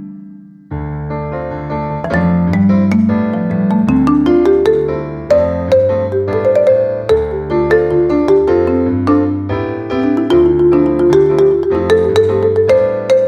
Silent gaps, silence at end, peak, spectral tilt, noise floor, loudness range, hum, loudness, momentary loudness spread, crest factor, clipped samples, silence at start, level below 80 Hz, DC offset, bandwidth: none; 0 s; 0 dBFS; -8.5 dB/octave; -35 dBFS; 3 LU; none; -13 LUFS; 10 LU; 12 dB; under 0.1%; 0 s; -34 dBFS; under 0.1%; 9.4 kHz